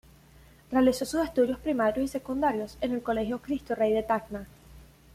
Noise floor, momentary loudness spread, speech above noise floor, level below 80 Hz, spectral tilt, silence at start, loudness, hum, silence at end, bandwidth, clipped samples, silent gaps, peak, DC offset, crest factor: -55 dBFS; 8 LU; 28 dB; -52 dBFS; -5.5 dB/octave; 0.7 s; -28 LUFS; none; 0.3 s; 15.5 kHz; under 0.1%; none; -12 dBFS; under 0.1%; 18 dB